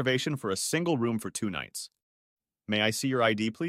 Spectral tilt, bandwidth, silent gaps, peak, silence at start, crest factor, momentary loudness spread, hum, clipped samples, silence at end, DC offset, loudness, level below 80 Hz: -4 dB/octave; 16 kHz; 2.03-2.37 s; -10 dBFS; 0 s; 20 dB; 13 LU; none; under 0.1%; 0 s; under 0.1%; -29 LUFS; -66 dBFS